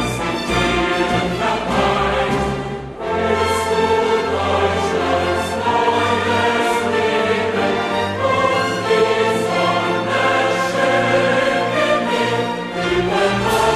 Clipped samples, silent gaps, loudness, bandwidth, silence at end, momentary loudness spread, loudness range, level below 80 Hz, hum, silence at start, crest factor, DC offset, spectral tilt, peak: under 0.1%; none; -17 LUFS; 14.5 kHz; 0 s; 4 LU; 2 LU; -40 dBFS; none; 0 s; 14 dB; under 0.1%; -4.5 dB/octave; -2 dBFS